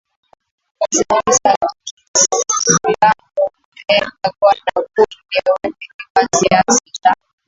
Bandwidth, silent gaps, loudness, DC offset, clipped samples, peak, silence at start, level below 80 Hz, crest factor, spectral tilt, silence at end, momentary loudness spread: 8 kHz; 1.57-1.61 s, 1.91-1.97 s, 2.08-2.14 s, 3.65-3.72 s, 5.94-5.99 s, 6.10-6.15 s; -15 LUFS; under 0.1%; under 0.1%; 0 dBFS; 0.8 s; -52 dBFS; 16 dB; -2 dB/octave; 0.35 s; 9 LU